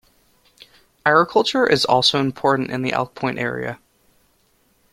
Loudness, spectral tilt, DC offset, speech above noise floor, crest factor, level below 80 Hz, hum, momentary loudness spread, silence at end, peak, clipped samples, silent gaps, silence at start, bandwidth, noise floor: -19 LUFS; -4.5 dB/octave; under 0.1%; 43 dB; 20 dB; -58 dBFS; none; 9 LU; 1.15 s; -2 dBFS; under 0.1%; none; 1.05 s; 15.5 kHz; -61 dBFS